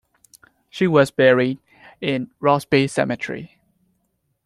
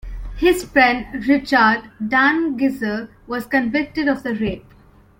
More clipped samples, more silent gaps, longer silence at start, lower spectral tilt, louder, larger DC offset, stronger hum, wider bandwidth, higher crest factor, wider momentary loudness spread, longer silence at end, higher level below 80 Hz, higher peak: neither; neither; first, 0.75 s vs 0.05 s; about the same, -6 dB/octave vs -5 dB/octave; about the same, -19 LUFS vs -18 LUFS; neither; neither; second, 13.5 kHz vs 16.5 kHz; about the same, 18 dB vs 18 dB; first, 15 LU vs 12 LU; first, 1 s vs 0.6 s; second, -60 dBFS vs -38 dBFS; about the same, -2 dBFS vs -2 dBFS